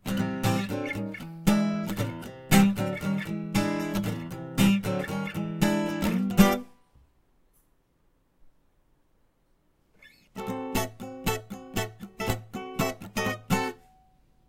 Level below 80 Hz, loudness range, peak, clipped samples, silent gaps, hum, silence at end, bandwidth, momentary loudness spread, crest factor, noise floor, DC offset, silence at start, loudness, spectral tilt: -46 dBFS; 10 LU; -4 dBFS; under 0.1%; none; none; 0.7 s; 17 kHz; 13 LU; 26 dB; -67 dBFS; under 0.1%; 0.05 s; -28 LUFS; -5.5 dB/octave